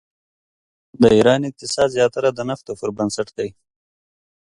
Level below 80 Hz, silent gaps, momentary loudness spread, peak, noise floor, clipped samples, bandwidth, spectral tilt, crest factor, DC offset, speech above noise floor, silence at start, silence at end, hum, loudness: -52 dBFS; none; 13 LU; 0 dBFS; under -90 dBFS; under 0.1%; 11.5 kHz; -5 dB/octave; 20 dB; under 0.1%; over 72 dB; 1 s; 1.05 s; none; -19 LUFS